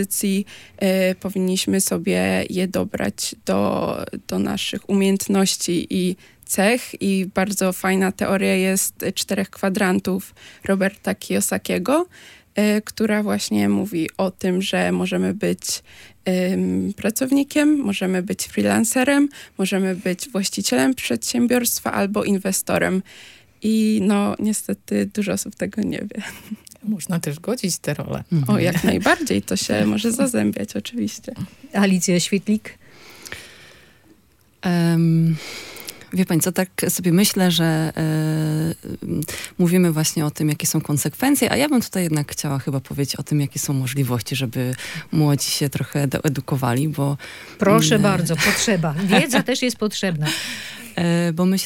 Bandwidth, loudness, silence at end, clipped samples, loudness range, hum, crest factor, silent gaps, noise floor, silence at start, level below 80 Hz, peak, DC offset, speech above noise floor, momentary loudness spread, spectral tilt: 17 kHz; -20 LUFS; 0 s; under 0.1%; 4 LU; none; 20 dB; none; -56 dBFS; 0 s; -56 dBFS; -2 dBFS; under 0.1%; 36 dB; 10 LU; -4.5 dB/octave